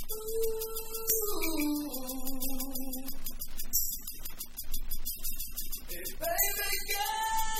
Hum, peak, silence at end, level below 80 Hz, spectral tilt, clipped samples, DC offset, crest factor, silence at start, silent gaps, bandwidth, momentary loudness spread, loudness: none; -14 dBFS; 0 s; -38 dBFS; -2 dB/octave; under 0.1%; under 0.1%; 18 dB; 0 s; none; 16.5 kHz; 11 LU; -34 LUFS